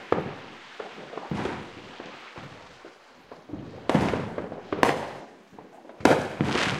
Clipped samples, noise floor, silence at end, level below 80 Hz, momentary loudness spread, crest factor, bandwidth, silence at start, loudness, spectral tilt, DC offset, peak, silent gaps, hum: under 0.1%; -50 dBFS; 0 s; -56 dBFS; 24 LU; 28 dB; 16 kHz; 0 s; -27 LUFS; -5.5 dB/octave; under 0.1%; 0 dBFS; none; none